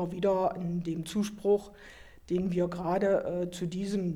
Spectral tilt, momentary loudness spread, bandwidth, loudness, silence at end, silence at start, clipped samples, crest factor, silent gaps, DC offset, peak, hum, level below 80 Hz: -7 dB/octave; 7 LU; 14.5 kHz; -31 LUFS; 0 s; 0 s; under 0.1%; 14 dB; none; under 0.1%; -16 dBFS; none; -56 dBFS